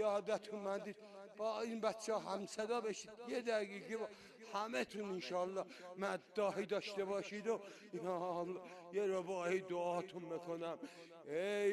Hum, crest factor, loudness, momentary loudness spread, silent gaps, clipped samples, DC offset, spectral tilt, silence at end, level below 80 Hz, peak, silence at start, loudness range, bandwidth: none; 18 dB; -43 LUFS; 8 LU; none; under 0.1%; under 0.1%; -4.5 dB/octave; 0 s; -86 dBFS; -24 dBFS; 0 s; 1 LU; 13 kHz